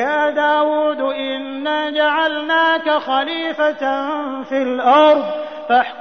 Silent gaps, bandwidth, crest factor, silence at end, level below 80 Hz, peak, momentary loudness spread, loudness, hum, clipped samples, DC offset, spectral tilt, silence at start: none; 6.4 kHz; 14 dB; 0 s; -66 dBFS; -2 dBFS; 10 LU; -17 LUFS; none; under 0.1%; 0.3%; -4 dB/octave; 0 s